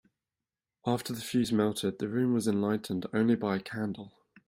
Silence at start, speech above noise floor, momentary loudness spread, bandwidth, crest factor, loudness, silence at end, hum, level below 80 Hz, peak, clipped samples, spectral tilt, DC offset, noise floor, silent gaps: 0.85 s; over 60 dB; 9 LU; 16 kHz; 16 dB; -31 LUFS; 0.4 s; none; -68 dBFS; -14 dBFS; under 0.1%; -6 dB/octave; under 0.1%; under -90 dBFS; none